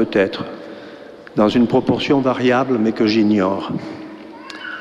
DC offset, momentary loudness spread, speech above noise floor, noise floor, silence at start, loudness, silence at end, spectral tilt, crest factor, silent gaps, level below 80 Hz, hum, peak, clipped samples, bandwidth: under 0.1%; 20 LU; 21 dB; -37 dBFS; 0 s; -17 LUFS; 0 s; -7 dB/octave; 16 dB; none; -52 dBFS; none; -2 dBFS; under 0.1%; 8.8 kHz